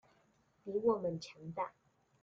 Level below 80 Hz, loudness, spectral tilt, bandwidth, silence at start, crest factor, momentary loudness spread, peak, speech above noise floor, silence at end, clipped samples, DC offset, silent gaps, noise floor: -76 dBFS; -38 LUFS; -7 dB/octave; 7.6 kHz; 0.65 s; 20 dB; 12 LU; -20 dBFS; 36 dB; 0.5 s; under 0.1%; under 0.1%; none; -73 dBFS